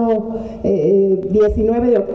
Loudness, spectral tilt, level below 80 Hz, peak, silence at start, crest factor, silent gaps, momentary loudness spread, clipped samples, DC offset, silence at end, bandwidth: -16 LUFS; -10 dB/octave; -34 dBFS; -6 dBFS; 0 s; 10 dB; none; 7 LU; under 0.1%; under 0.1%; 0 s; 6.2 kHz